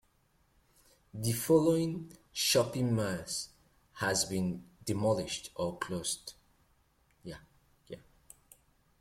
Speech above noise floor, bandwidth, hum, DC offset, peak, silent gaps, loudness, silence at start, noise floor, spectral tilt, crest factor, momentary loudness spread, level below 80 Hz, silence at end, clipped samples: 39 dB; 16.5 kHz; none; under 0.1%; -14 dBFS; none; -32 LUFS; 1.15 s; -71 dBFS; -4 dB/octave; 20 dB; 22 LU; -64 dBFS; 1 s; under 0.1%